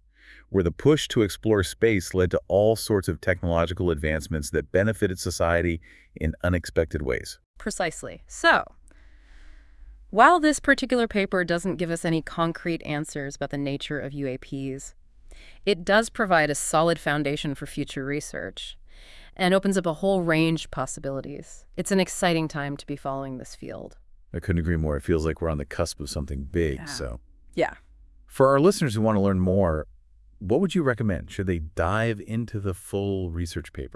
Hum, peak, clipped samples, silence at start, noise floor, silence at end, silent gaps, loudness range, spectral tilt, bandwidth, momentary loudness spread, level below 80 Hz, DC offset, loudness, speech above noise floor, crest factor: none; -2 dBFS; under 0.1%; 0.3 s; -52 dBFS; 0 s; 7.46-7.54 s; 6 LU; -5.5 dB/octave; 12 kHz; 13 LU; -44 dBFS; under 0.1%; -25 LUFS; 28 dB; 24 dB